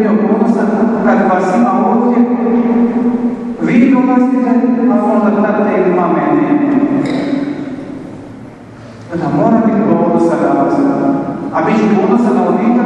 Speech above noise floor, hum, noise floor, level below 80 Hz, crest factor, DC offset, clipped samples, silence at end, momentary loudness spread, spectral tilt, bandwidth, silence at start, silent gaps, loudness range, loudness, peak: 21 dB; none; -32 dBFS; -50 dBFS; 12 dB; under 0.1%; under 0.1%; 0 s; 9 LU; -8.5 dB/octave; 8.6 kHz; 0 s; none; 4 LU; -12 LUFS; 0 dBFS